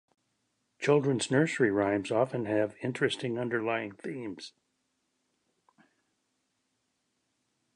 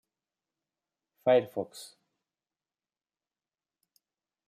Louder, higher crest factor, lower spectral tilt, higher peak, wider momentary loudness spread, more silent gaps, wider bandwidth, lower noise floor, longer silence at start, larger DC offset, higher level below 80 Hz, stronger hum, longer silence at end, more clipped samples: about the same, -30 LUFS vs -29 LUFS; about the same, 20 dB vs 22 dB; about the same, -5.5 dB/octave vs -5.5 dB/octave; about the same, -12 dBFS vs -14 dBFS; second, 13 LU vs 22 LU; neither; second, 11 kHz vs 15 kHz; second, -79 dBFS vs under -90 dBFS; second, 0.8 s vs 1.25 s; neither; first, -72 dBFS vs -88 dBFS; neither; first, 3.25 s vs 2.65 s; neither